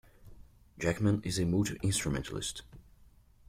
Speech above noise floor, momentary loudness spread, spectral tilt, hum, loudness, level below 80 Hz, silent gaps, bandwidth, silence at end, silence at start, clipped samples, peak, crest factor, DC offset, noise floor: 28 dB; 8 LU; -5 dB/octave; none; -32 LUFS; -52 dBFS; none; 16 kHz; 0.7 s; 0.2 s; under 0.1%; -16 dBFS; 18 dB; under 0.1%; -60 dBFS